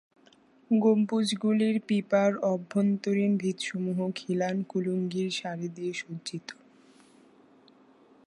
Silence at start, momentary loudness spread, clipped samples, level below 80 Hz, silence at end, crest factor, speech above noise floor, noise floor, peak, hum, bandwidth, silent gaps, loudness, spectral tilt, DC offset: 0.7 s; 11 LU; under 0.1%; -78 dBFS; 1.75 s; 18 dB; 33 dB; -60 dBFS; -12 dBFS; none; 11.5 kHz; none; -28 LUFS; -6 dB/octave; under 0.1%